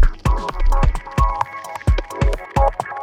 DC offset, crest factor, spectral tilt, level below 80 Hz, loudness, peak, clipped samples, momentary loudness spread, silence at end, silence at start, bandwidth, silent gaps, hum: under 0.1%; 14 dB; -6.5 dB/octave; -18 dBFS; -21 LUFS; -2 dBFS; under 0.1%; 4 LU; 0 s; 0 s; 13 kHz; none; none